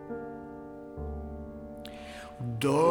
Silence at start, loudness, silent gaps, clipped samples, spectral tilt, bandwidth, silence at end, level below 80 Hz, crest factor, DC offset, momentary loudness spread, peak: 0 s; -36 LUFS; none; under 0.1%; -6.5 dB/octave; 19 kHz; 0 s; -48 dBFS; 20 dB; under 0.1%; 15 LU; -12 dBFS